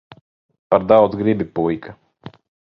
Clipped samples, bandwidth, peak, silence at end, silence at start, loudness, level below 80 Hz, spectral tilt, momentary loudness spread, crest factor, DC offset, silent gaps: under 0.1%; 5.6 kHz; 0 dBFS; 0.35 s; 0.7 s; -17 LUFS; -52 dBFS; -10 dB/octave; 9 LU; 20 dB; under 0.1%; none